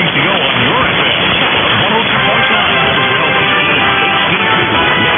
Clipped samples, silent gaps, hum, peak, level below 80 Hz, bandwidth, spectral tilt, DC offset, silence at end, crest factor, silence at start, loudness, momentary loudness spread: under 0.1%; none; none; 0 dBFS; -38 dBFS; 4 kHz; -7.5 dB/octave; 0.1%; 0 s; 10 dB; 0 s; -9 LUFS; 1 LU